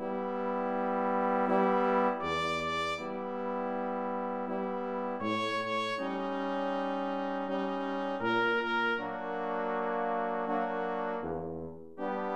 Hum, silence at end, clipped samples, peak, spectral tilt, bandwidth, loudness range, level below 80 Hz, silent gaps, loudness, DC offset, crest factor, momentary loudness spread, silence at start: none; 0 s; under 0.1%; -16 dBFS; -6 dB/octave; 11 kHz; 3 LU; -66 dBFS; none; -32 LUFS; 0.2%; 16 dB; 7 LU; 0 s